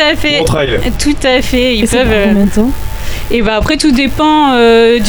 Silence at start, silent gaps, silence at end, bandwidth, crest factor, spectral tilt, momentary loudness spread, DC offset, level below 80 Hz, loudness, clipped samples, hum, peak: 0 s; none; 0 s; over 20 kHz; 10 dB; -4.5 dB/octave; 8 LU; under 0.1%; -22 dBFS; -10 LUFS; under 0.1%; none; 0 dBFS